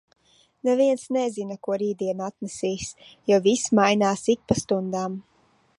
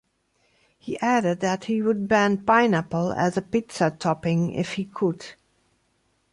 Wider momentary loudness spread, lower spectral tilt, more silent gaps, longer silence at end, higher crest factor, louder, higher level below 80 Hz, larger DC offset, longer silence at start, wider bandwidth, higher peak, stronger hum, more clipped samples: first, 13 LU vs 9 LU; second, -4.5 dB/octave vs -6 dB/octave; neither; second, 0.6 s vs 1 s; about the same, 20 dB vs 18 dB; about the same, -24 LUFS vs -23 LUFS; about the same, -58 dBFS vs -60 dBFS; neither; second, 0.65 s vs 0.85 s; about the same, 11.5 kHz vs 11.5 kHz; about the same, -6 dBFS vs -6 dBFS; neither; neither